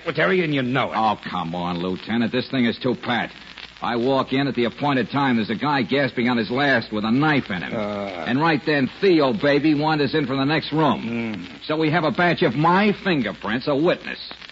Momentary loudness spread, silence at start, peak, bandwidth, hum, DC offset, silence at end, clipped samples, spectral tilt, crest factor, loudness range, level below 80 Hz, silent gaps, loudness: 8 LU; 0 s; -8 dBFS; 7.8 kHz; none; under 0.1%; 0 s; under 0.1%; -7.5 dB/octave; 14 dB; 3 LU; -56 dBFS; none; -21 LUFS